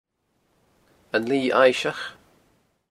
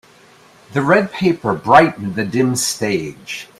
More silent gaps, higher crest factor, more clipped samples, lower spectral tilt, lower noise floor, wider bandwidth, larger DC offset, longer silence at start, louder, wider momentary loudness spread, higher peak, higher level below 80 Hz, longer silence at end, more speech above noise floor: neither; about the same, 22 dB vs 18 dB; neither; about the same, -4 dB/octave vs -4.5 dB/octave; first, -70 dBFS vs -47 dBFS; second, 12.5 kHz vs 16 kHz; neither; first, 1.15 s vs 0.7 s; second, -22 LUFS vs -16 LUFS; first, 15 LU vs 12 LU; about the same, -2 dBFS vs 0 dBFS; second, -68 dBFS vs -52 dBFS; first, 0.8 s vs 0.15 s; first, 49 dB vs 31 dB